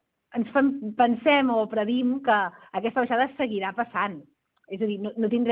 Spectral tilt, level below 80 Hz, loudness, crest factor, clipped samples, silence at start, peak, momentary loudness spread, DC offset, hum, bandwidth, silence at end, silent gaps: -8.5 dB/octave; -70 dBFS; -25 LUFS; 18 dB; under 0.1%; 0.35 s; -8 dBFS; 10 LU; under 0.1%; none; 4.2 kHz; 0 s; none